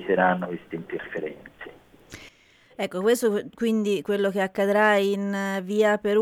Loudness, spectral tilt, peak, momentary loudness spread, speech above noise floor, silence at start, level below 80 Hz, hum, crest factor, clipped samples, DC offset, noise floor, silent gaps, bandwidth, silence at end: -24 LUFS; -5.5 dB/octave; -8 dBFS; 22 LU; 33 dB; 0 s; -64 dBFS; none; 18 dB; under 0.1%; under 0.1%; -57 dBFS; none; 17 kHz; 0 s